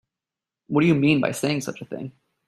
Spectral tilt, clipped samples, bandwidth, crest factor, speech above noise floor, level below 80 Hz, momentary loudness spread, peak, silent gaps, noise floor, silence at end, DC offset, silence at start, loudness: -6 dB/octave; under 0.1%; 13.5 kHz; 18 dB; 67 dB; -60 dBFS; 17 LU; -6 dBFS; none; -89 dBFS; 0.35 s; under 0.1%; 0.7 s; -22 LUFS